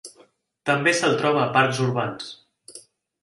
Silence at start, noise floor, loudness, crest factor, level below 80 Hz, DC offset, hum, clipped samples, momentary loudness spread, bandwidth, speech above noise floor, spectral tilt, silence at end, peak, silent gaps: 0.05 s; -57 dBFS; -21 LUFS; 20 dB; -66 dBFS; under 0.1%; none; under 0.1%; 18 LU; 11.5 kHz; 36 dB; -4.5 dB/octave; 0.4 s; -4 dBFS; none